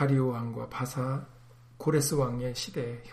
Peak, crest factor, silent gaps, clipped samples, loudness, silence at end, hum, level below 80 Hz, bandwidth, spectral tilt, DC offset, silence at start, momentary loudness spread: -16 dBFS; 16 dB; none; under 0.1%; -31 LUFS; 0 s; none; -54 dBFS; 15.5 kHz; -5.5 dB/octave; under 0.1%; 0 s; 10 LU